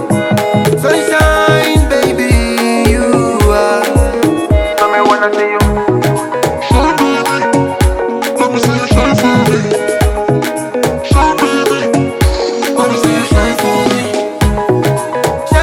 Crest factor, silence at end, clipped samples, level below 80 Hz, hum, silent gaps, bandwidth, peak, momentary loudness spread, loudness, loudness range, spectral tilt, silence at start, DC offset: 10 dB; 0 s; under 0.1%; -20 dBFS; none; none; 17.5 kHz; 0 dBFS; 4 LU; -11 LUFS; 2 LU; -5.5 dB/octave; 0 s; under 0.1%